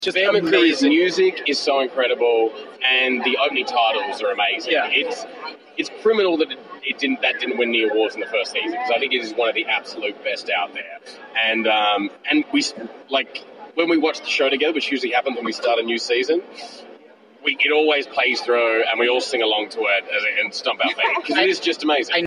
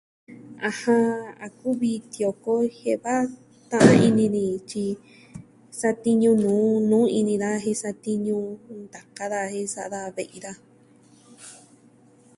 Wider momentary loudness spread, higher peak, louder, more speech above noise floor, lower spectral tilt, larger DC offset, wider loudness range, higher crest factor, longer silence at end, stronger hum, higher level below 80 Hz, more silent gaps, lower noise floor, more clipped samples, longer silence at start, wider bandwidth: second, 9 LU vs 20 LU; second, -4 dBFS vs 0 dBFS; first, -19 LUFS vs -23 LUFS; second, 27 dB vs 32 dB; second, -2.5 dB/octave vs -6 dB/octave; neither; second, 3 LU vs 11 LU; second, 18 dB vs 24 dB; second, 0 s vs 0.85 s; neither; second, -74 dBFS vs -62 dBFS; neither; second, -47 dBFS vs -55 dBFS; neither; second, 0 s vs 0.3 s; about the same, 11 kHz vs 11.5 kHz